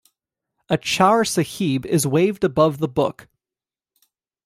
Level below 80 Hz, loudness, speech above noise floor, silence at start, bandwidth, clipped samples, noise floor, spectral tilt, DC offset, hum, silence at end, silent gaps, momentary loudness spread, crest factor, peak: -56 dBFS; -20 LUFS; over 71 dB; 0.7 s; 16 kHz; under 0.1%; under -90 dBFS; -5 dB/octave; under 0.1%; none; 1.25 s; none; 7 LU; 18 dB; -2 dBFS